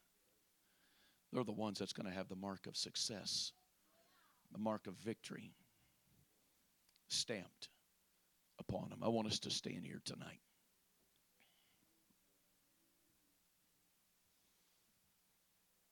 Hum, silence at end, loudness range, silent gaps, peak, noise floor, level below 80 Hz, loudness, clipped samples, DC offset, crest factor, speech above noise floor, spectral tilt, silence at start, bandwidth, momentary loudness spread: none; 5.55 s; 7 LU; none; -24 dBFS; -79 dBFS; -80 dBFS; -44 LUFS; under 0.1%; under 0.1%; 24 dB; 33 dB; -3.5 dB/octave; 1.3 s; 19 kHz; 16 LU